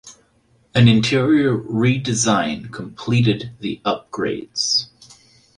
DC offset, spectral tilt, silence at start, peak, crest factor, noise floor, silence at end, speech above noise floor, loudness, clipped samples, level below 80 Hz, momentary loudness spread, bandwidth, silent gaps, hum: under 0.1%; -5 dB/octave; 0.05 s; -2 dBFS; 18 dB; -59 dBFS; 0.7 s; 41 dB; -19 LUFS; under 0.1%; -52 dBFS; 12 LU; 10.5 kHz; none; none